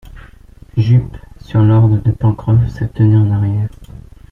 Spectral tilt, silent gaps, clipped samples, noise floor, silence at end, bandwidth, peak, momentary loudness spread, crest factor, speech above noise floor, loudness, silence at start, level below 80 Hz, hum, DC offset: -10.5 dB/octave; none; under 0.1%; -39 dBFS; 0.3 s; 5.8 kHz; -2 dBFS; 10 LU; 12 dB; 27 dB; -14 LUFS; 0.05 s; -34 dBFS; none; under 0.1%